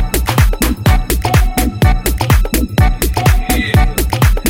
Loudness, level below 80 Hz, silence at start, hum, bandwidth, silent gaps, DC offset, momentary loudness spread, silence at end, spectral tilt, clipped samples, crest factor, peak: -13 LUFS; -14 dBFS; 0 s; none; 17 kHz; none; under 0.1%; 2 LU; 0 s; -5 dB/octave; under 0.1%; 12 dB; 0 dBFS